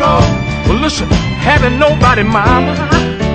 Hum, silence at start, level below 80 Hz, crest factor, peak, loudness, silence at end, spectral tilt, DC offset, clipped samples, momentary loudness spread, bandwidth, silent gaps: none; 0 s; -22 dBFS; 10 dB; 0 dBFS; -11 LUFS; 0 s; -6 dB/octave; under 0.1%; 0.2%; 4 LU; 9 kHz; none